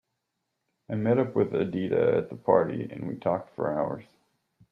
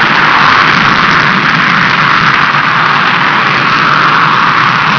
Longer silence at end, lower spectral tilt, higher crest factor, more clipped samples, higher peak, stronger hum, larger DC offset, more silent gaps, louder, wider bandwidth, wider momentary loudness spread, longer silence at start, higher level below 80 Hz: first, 0.7 s vs 0 s; first, -10 dB/octave vs -4 dB/octave; first, 20 dB vs 8 dB; second, under 0.1% vs 4%; second, -8 dBFS vs 0 dBFS; neither; neither; neither; second, -27 LUFS vs -6 LUFS; about the same, 5.2 kHz vs 5.4 kHz; first, 10 LU vs 2 LU; first, 0.9 s vs 0 s; second, -66 dBFS vs -42 dBFS